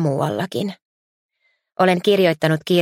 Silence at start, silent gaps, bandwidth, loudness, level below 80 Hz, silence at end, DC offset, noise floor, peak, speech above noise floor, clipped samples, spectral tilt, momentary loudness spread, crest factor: 0 s; 0.85-1.29 s; 16.5 kHz; -19 LUFS; -64 dBFS; 0 s; under 0.1%; -61 dBFS; -2 dBFS; 43 dB; under 0.1%; -6 dB/octave; 11 LU; 18 dB